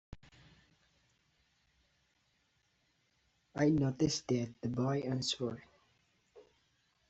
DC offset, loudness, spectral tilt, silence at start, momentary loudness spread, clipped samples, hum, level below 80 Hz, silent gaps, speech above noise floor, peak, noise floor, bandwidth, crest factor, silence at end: under 0.1%; -35 LUFS; -6 dB/octave; 0.1 s; 10 LU; under 0.1%; none; -66 dBFS; none; 43 dB; -18 dBFS; -77 dBFS; 8 kHz; 20 dB; 0.7 s